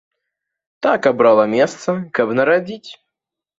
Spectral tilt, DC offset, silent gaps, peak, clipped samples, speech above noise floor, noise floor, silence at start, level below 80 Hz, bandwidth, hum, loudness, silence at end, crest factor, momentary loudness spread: -5.5 dB/octave; under 0.1%; none; -2 dBFS; under 0.1%; 67 dB; -83 dBFS; 0.8 s; -62 dBFS; 7.8 kHz; none; -16 LUFS; 0.65 s; 16 dB; 10 LU